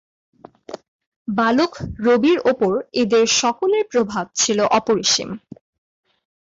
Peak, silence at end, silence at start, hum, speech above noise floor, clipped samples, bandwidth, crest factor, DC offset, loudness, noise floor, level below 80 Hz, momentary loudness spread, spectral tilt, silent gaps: -6 dBFS; 1.15 s; 0.7 s; none; 19 dB; under 0.1%; 7.8 kHz; 14 dB; under 0.1%; -18 LUFS; -38 dBFS; -52 dBFS; 19 LU; -3 dB/octave; 0.88-0.99 s, 1.07-1.25 s